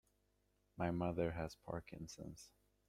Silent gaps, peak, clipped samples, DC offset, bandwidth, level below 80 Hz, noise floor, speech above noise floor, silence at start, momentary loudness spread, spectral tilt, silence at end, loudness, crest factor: none; -26 dBFS; under 0.1%; under 0.1%; 14 kHz; -64 dBFS; -80 dBFS; 36 dB; 0.75 s; 19 LU; -6.5 dB/octave; 0.4 s; -45 LUFS; 20 dB